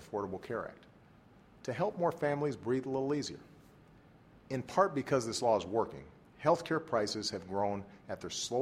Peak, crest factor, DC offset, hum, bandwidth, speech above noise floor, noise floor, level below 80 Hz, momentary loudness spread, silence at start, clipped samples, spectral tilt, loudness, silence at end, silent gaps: -14 dBFS; 22 dB; under 0.1%; none; 15.5 kHz; 26 dB; -60 dBFS; -68 dBFS; 12 LU; 0 s; under 0.1%; -5 dB/octave; -35 LUFS; 0 s; none